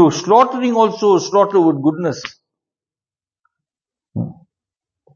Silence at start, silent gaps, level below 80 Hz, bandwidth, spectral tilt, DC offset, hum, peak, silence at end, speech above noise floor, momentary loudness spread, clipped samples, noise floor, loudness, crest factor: 0 s; none; -62 dBFS; 7.2 kHz; -6 dB/octave; under 0.1%; none; 0 dBFS; 0.8 s; over 76 dB; 16 LU; under 0.1%; under -90 dBFS; -15 LUFS; 18 dB